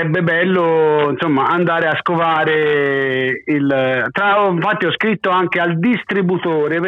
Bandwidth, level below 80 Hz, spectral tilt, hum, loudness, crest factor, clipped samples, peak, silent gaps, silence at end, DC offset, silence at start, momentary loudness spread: 6.4 kHz; -60 dBFS; -8 dB/octave; none; -15 LUFS; 8 dB; under 0.1%; -6 dBFS; none; 0 s; under 0.1%; 0 s; 3 LU